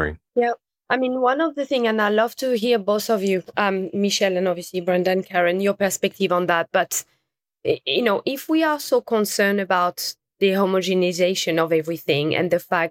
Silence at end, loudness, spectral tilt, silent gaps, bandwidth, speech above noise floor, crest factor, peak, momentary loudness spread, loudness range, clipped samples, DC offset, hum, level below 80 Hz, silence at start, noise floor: 0 s; -21 LUFS; -4 dB/octave; none; 17 kHz; 54 dB; 16 dB; -4 dBFS; 5 LU; 1 LU; under 0.1%; under 0.1%; none; -54 dBFS; 0 s; -75 dBFS